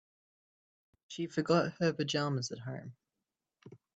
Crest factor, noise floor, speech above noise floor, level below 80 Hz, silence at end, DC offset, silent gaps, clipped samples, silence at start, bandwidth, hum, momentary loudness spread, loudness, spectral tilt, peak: 20 dB; -89 dBFS; 56 dB; -76 dBFS; 0.2 s; under 0.1%; none; under 0.1%; 1.1 s; 8.4 kHz; none; 16 LU; -34 LUFS; -5.5 dB/octave; -16 dBFS